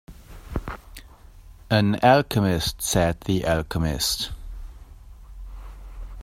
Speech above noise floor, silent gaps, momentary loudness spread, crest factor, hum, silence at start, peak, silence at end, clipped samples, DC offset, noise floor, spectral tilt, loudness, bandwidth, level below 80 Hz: 25 dB; none; 24 LU; 20 dB; none; 0.1 s; -4 dBFS; 0 s; under 0.1%; under 0.1%; -46 dBFS; -4.5 dB/octave; -23 LUFS; 16 kHz; -38 dBFS